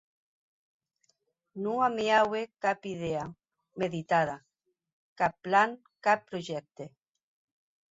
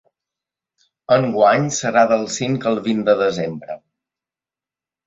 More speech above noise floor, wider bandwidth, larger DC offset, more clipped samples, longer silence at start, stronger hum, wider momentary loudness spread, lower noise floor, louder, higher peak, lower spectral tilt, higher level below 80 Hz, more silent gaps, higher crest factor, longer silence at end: second, 47 dB vs 73 dB; about the same, 8 kHz vs 8 kHz; neither; neither; first, 1.55 s vs 1.1 s; neither; first, 20 LU vs 12 LU; second, -76 dBFS vs -90 dBFS; second, -30 LUFS vs -18 LUFS; second, -12 dBFS vs -2 dBFS; about the same, -5 dB/octave vs -5 dB/octave; second, -70 dBFS vs -62 dBFS; first, 4.93-5.16 s vs none; about the same, 20 dB vs 18 dB; second, 1.05 s vs 1.3 s